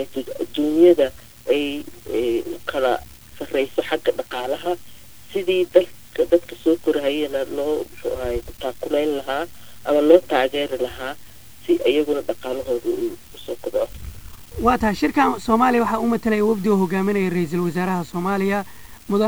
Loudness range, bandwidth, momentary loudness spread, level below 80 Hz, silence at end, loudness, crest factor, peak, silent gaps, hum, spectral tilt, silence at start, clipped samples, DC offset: 5 LU; over 20 kHz; 13 LU; -46 dBFS; 0 s; -21 LUFS; 20 dB; 0 dBFS; none; none; -6 dB/octave; 0 s; under 0.1%; 1%